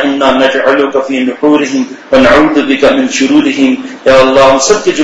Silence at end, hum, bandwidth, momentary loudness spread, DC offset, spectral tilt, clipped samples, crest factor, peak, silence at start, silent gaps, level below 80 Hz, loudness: 0 s; none; 9.2 kHz; 6 LU; under 0.1%; -3.5 dB/octave; 3%; 8 dB; 0 dBFS; 0 s; none; -36 dBFS; -8 LUFS